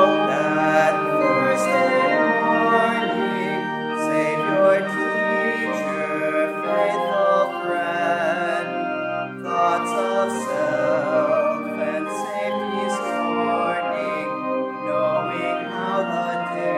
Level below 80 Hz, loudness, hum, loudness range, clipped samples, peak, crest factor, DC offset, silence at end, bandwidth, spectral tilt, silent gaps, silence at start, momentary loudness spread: -72 dBFS; -21 LUFS; none; 4 LU; under 0.1%; -4 dBFS; 18 dB; under 0.1%; 0 s; 14 kHz; -5 dB/octave; none; 0 s; 7 LU